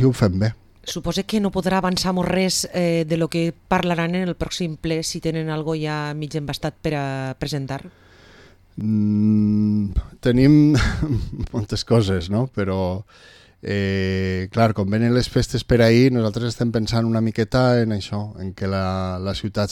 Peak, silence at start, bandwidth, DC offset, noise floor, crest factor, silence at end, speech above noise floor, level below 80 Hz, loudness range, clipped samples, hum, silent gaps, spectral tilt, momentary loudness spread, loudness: -4 dBFS; 0 s; 15 kHz; under 0.1%; -49 dBFS; 16 dB; 0 s; 29 dB; -38 dBFS; 6 LU; under 0.1%; none; none; -6 dB/octave; 10 LU; -21 LUFS